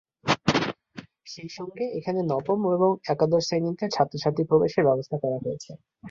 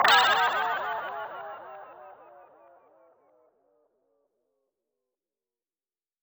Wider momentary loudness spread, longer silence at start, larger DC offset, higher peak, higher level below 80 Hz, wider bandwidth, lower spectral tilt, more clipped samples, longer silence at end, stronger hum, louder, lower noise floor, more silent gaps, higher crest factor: second, 18 LU vs 26 LU; first, 0.25 s vs 0 s; neither; about the same, -6 dBFS vs -8 dBFS; first, -60 dBFS vs -78 dBFS; second, 7.6 kHz vs over 20 kHz; first, -6 dB/octave vs -0.5 dB/octave; neither; second, 0 s vs 4.1 s; neither; about the same, -25 LUFS vs -25 LUFS; second, -46 dBFS vs under -90 dBFS; neither; about the same, 20 dB vs 24 dB